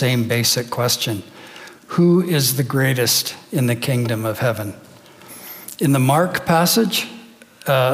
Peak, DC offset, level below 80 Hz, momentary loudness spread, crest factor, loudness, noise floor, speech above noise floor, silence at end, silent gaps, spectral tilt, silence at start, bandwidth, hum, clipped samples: -2 dBFS; under 0.1%; -62 dBFS; 18 LU; 16 dB; -18 LUFS; -42 dBFS; 24 dB; 0 s; none; -4.5 dB/octave; 0 s; 16.5 kHz; none; under 0.1%